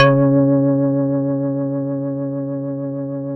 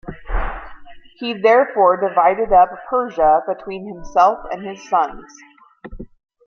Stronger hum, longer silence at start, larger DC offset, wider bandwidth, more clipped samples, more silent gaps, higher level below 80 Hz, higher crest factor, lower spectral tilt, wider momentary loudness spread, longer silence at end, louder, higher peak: neither; about the same, 0 s vs 0.05 s; neither; second, 5.8 kHz vs 6.8 kHz; neither; neither; second, -58 dBFS vs -34 dBFS; about the same, 16 dB vs 16 dB; first, -9 dB/octave vs -5.5 dB/octave; second, 10 LU vs 15 LU; second, 0 s vs 0.4 s; about the same, -19 LUFS vs -17 LUFS; about the same, 0 dBFS vs -2 dBFS